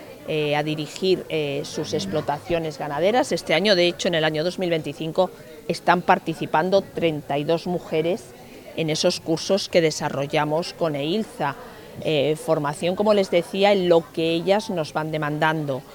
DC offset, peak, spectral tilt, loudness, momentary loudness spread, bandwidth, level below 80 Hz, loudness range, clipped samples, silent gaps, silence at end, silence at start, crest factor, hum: under 0.1%; -2 dBFS; -5 dB/octave; -23 LUFS; 8 LU; 19.5 kHz; -56 dBFS; 3 LU; under 0.1%; none; 0 s; 0 s; 20 dB; none